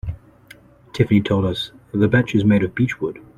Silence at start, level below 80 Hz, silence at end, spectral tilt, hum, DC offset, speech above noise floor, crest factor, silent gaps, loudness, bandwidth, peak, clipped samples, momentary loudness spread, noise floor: 0.05 s; -44 dBFS; 0.2 s; -7.5 dB/octave; none; under 0.1%; 29 dB; 18 dB; none; -19 LUFS; 10 kHz; -2 dBFS; under 0.1%; 14 LU; -47 dBFS